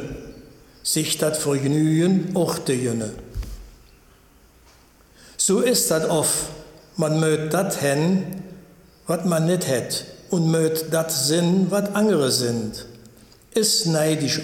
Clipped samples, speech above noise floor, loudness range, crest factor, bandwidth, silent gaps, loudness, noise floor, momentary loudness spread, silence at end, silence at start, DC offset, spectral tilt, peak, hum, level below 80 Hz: under 0.1%; 32 dB; 4 LU; 16 dB; 17.5 kHz; none; -21 LUFS; -53 dBFS; 17 LU; 0 s; 0 s; under 0.1%; -4.5 dB/octave; -6 dBFS; none; -46 dBFS